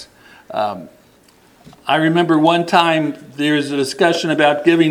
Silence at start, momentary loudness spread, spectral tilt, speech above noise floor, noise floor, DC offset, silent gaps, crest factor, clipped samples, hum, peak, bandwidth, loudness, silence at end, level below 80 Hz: 0 s; 11 LU; -5 dB/octave; 35 dB; -50 dBFS; under 0.1%; none; 16 dB; under 0.1%; none; 0 dBFS; 15.5 kHz; -16 LUFS; 0 s; -64 dBFS